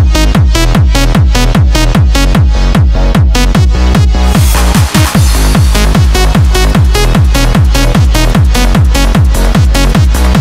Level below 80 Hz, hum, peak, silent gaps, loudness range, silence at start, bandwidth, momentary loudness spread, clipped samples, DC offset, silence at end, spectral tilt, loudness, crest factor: -8 dBFS; none; 0 dBFS; none; 0 LU; 0 s; 16.5 kHz; 1 LU; 0.3%; under 0.1%; 0 s; -5.5 dB/octave; -8 LUFS; 6 dB